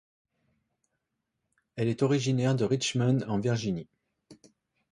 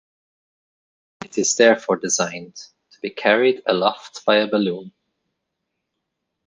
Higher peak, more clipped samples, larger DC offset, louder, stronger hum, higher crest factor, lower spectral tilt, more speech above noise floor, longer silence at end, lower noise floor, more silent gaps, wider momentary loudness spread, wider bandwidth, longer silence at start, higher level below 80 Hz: second, -14 dBFS vs -2 dBFS; neither; neither; second, -28 LUFS vs -19 LUFS; neither; about the same, 18 dB vs 20 dB; first, -6 dB/octave vs -2.5 dB/octave; second, 55 dB vs 59 dB; second, 0.6 s vs 1.6 s; first, -83 dBFS vs -78 dBFS; neither; second, 7 LU vs 17 LU; about the same, 11 kHz vs 10.5 kHz; first, 1.75 s vs 1.2 s; first, -64 dBFS vs -70 dBFS